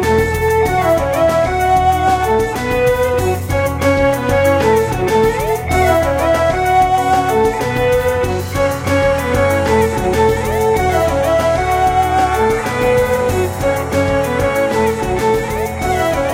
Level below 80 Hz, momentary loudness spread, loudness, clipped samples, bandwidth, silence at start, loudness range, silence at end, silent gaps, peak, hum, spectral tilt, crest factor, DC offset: -28 dBFS; 4 LU; -14 LUFS; under 0.1%; 16.5 kHz; 0 s; 1 LU; 0 s; none; 0 dBFS; none; -5.5 dB/octave; 12 dB; under 0.1%